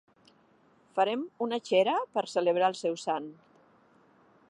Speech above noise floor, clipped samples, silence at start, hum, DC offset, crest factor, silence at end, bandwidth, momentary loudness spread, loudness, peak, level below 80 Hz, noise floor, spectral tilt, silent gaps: 35 dB; under 0.1%; 0.95 s; none; under 0.1%; 18 dB; 1.15 s; 11 kHz; 8 LU; -29 LUFS; -12 dBFS; -86 dBFS; -64 dBFS; -4.5 dB/octave; none